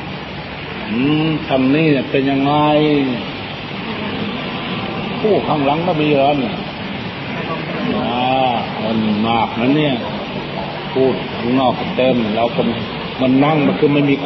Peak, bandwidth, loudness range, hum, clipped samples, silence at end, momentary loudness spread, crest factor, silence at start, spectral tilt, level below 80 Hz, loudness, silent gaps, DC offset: -2 dBFS; 6 kHz; 2 LU; none; under 0.1%; 0 s; 10 LU; 14 dB; 0 s; -8.5 dB/octave; -44 dBFS; -17 LUFS; none; under 0.1%